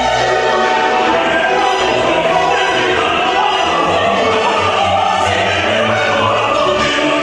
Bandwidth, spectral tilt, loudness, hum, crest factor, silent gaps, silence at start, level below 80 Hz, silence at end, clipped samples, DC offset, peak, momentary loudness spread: 11.5 kHz; -3.5 dB/octave; -13 LUFS; none; 12 dB; none; 0 s; -42 dBFS; 0 s; under 0.1%; under 0.1%; 0 dBFS; 1 LU